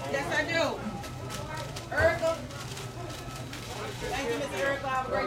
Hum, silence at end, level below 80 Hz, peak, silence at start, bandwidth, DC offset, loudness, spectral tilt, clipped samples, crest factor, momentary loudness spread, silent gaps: none; 0 s; -50 dBFS; -12 dBFS; 0 s; 16.5 kHz; under 0.1%; -31 LUFS; -4.5 dB/octave; under 0.1%; 20 dB; 12 LU; none